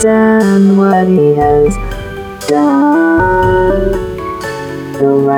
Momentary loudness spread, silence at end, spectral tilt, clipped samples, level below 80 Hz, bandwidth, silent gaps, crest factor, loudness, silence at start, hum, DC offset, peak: 13 LU; 0 s; -7 dB/octave; under 0.1%; -26 dBFS; 16 kHz; none; 10 dB; -10 LUFS; 0 s; none; under 0.1%; 0 dBFS